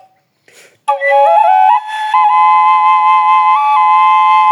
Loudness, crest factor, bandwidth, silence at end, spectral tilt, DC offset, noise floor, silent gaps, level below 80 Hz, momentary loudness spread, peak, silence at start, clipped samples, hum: -9 LUFS; 8 dB; 11 kHz; 0 s; 0.5 dB/octave; under 0.1%; -50 dBFS; none; -84 dBFS; 6 LU; 0 dBFS; 0.9 s; under 0.1%; none